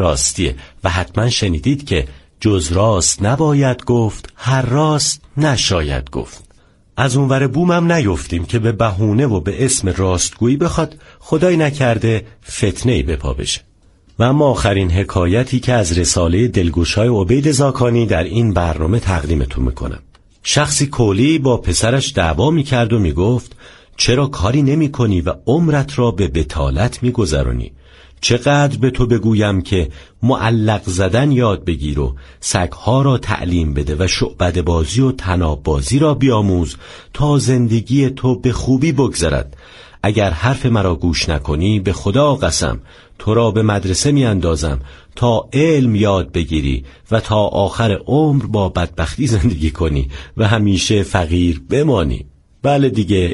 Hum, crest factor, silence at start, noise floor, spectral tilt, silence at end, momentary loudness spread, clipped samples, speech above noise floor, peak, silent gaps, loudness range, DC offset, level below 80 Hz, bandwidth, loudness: none; 14 dB; 0 s; -49 dBFS; -5.5 dB/octave; 0 s; 7 LU; under 0.1%; 35 dB; 0 dBFS; none; 2 LU; under 0.1%; -28 dBFS; 11.5 kHz; -15 LUFS